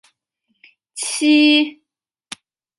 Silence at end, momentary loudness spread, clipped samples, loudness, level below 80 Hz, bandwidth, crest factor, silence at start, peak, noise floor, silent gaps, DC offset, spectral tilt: 1.05 s; 24 LU; under 0.1%; -15 LUFS; -78 dBFS; 11.5 kHz; 16 dB; 0.95 s; -4 dBFS; -81 dBFS; none; under 0.1%; -0.5 dB/octave